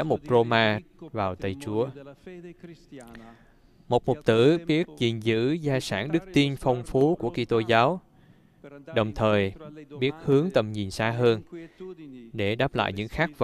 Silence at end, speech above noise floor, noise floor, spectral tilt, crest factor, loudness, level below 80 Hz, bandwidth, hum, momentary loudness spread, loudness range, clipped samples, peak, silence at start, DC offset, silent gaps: 0 s; 31 dB; -57 dBFS; -6.5 dB/octave; 20 dB; -25 LUFS; -52 dBFS; 13.5 kHz; none; 22 LU; 4 LU; under 0.1%; -6 dBFS; 0 s; under 0.1%; none